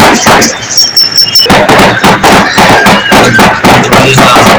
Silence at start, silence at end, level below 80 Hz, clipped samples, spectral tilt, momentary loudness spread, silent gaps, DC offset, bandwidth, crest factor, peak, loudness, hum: 0 s; 0 s; -26 dBFS; 30%; -3 dB/octave; 2 LU; none; under 0.1%; over 20 kHz; 4 dB; 0 dBFS; -2 LUFS; none